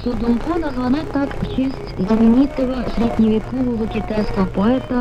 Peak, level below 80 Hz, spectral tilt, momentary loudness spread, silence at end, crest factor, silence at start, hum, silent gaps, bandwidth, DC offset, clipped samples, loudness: -4 dBFS; -30 dBFS; -8 dB/octave; 8 LU; 0 s; 14 dB; 0 s; none; none; 9 kHz; under 0.1%; under 0.1%; -19 LUFS